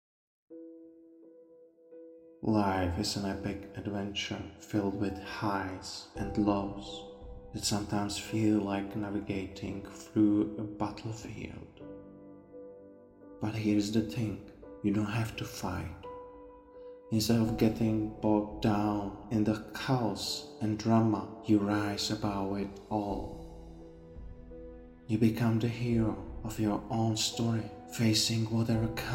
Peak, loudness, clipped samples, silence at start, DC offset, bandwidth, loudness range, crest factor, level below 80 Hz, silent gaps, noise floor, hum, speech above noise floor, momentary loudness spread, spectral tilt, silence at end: -14 dBFS; -32 LUFS; under 0.1%; 0.5 s; under 0.1%; 16.5 kHz; 5 LU; 20 dB; -54 dBFS; none; -58 dBFS; none; 27 dB; 22 LU; -5.5 dB/octave; 0 s